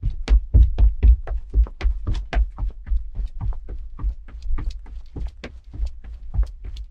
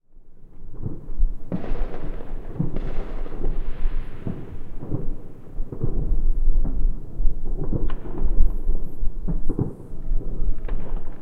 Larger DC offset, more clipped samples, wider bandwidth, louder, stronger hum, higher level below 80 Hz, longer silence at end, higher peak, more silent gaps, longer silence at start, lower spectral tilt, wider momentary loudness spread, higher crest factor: neither; neither; first, 5.4 kHz vs 2.2 kHz; first, -25 LUFS vs -31 LUFS; neither; about the same, -22 dBFS vs -22 dBFS; about the same, 0.05 s vs 0 s; about the same, -4 dBFS vs -2 dBFS; neither; second, 0 s vs 0.25 s; second, -7.5 dB/octave vs -10 dB/octave; first, 19 LU vs 10 LU; about the same, 16 dB vs 16 dB